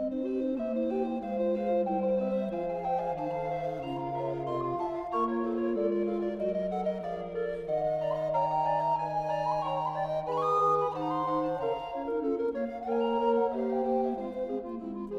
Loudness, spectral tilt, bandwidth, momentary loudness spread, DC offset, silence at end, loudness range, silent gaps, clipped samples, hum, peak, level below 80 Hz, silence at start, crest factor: -31 LUFS; -8 dB/octave; 7.8 kHz; 6 LU; under 0.1%; 0 s; 3 LU; none; under 0.1%; none; -16 dBFS; -58 dBFS; 0 s; 14 dB